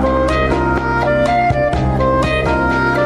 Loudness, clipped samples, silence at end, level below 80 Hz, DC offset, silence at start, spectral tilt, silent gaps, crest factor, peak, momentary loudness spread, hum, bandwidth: -15 LUFS; under 0.1%; 0 s; -24 dBFS; under 0.1%; 0 s; -7 dB/octave; none; 10 dB; -4 dBFS; 2 LU; none; 11 kHz